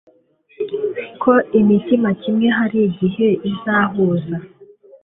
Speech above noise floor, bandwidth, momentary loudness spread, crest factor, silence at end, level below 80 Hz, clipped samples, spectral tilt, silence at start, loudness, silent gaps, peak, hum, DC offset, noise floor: 37 dB; 3.9 kHz; 10 LU; 16 dB; 0.4 s; -56 dBFS; under 0.1%; -12 dB/octave; 0.6 s; -17 LUFS; none; -2 dBFS; none; under 0.1%; -54 dBFS